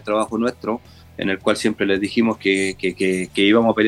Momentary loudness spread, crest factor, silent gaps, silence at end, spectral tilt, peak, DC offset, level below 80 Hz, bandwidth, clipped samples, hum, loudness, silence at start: 11 LU; 16 dB; none; 0 s; -4.5 dB/octave; -2 dBFS; under 0.1%; -52 dBFS; 12.5 kHz; under 0.1%; none; -20 LUFS; 0.05 s